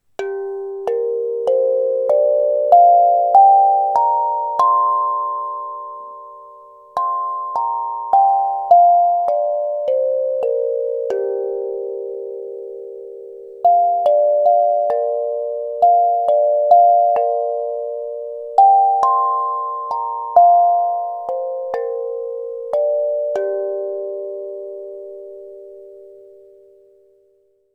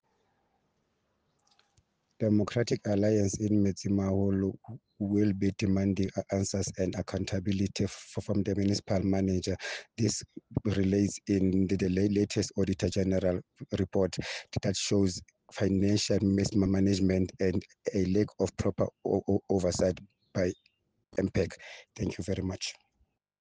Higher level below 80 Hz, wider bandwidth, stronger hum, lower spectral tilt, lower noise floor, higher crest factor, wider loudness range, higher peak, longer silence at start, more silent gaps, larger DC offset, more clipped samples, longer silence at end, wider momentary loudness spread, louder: second, -70 dBFS vs -56 dBFS; second, 6 kHz vs 9.8 kHz; neither; about the same, -5 dB/octave vs -6 dB/octave; second, -59 dBFS vs -76 dBFS; about the same, 16 dB vs 16 dB; first, 10 LU vs 3 LU; first, 0 dBFS vs -14 dBFS; second, 0.2 s vs 2.2 s; neither; neither; neither; first, 1.6 s vs 0.7 s; first, 18 LU vs 9 LU; first, -16 LUFS vs -30 LUFS